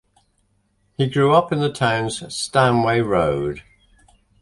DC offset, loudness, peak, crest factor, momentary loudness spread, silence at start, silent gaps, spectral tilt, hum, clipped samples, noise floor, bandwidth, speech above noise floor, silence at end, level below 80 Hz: under 0.1%; -19 LUFS; -2 dBFS; 20 dB; 10 LU; 1 s; none; -5.5 dB/octave; none; under 0.1%; -65 dBFS; 11.5 kHz; 46 dB; 0.8 s; -48 dBFS